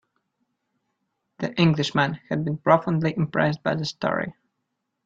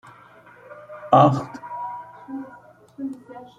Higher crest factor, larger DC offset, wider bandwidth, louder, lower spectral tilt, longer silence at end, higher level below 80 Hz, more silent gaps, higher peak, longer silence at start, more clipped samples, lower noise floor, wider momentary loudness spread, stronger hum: about the same, 24 dB vs 24 dB; neither; second, 7.8 kHz vs 9.6 kHz; about the same, -23 LUFS vs -21 LUFS; second, -6.5 dB/octave vs -8 dB/octave; first, 0.75 s vs 0.15 s; about the same, -60 dBFS vs -64 dBFS; neither; about the same, -2 dBFS vs -2 dBFS; first, 1.4 s vs 0.05 s; neither; first, -79 dBFS vs -49 dBFS; second, 9 LU vs 26 LU; neither